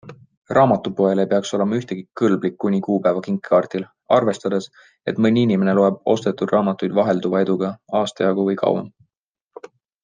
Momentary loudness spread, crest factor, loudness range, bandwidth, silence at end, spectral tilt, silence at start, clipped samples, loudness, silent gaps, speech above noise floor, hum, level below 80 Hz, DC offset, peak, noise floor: 8 LU; 18 dB; 2 LU; 9.6 kHz; 1.15 s; -7 dB/octave; 0.05 s; under 0.1%; -19 LUFS; 0.37-0.42 s; 58 dB; none; -66 dBFS; under 0.1%; -2 dBFS; -77 dBFS